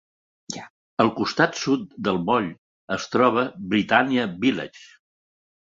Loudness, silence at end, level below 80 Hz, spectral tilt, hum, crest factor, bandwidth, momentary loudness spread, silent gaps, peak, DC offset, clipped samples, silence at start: -23 LUFS; 0.8 s; -60 dBFS; -5 dB/octave; none; 22 dB; 7.8 kHz; 15 LU; 0.70-0.97 s, 2.58-2.88 s; -2 dBFS; under 0.1%; under 0.1%; 0.5 s